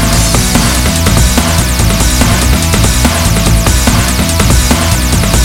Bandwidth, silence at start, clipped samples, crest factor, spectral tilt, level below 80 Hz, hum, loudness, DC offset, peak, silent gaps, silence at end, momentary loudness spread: 18 kHz; 0 s; 0.6%; 8 dB; -4 dB/octave; -12 dBFS; none; -9 LUFS; 0.8%; 0 dBFS; none; 0 s; 1 LU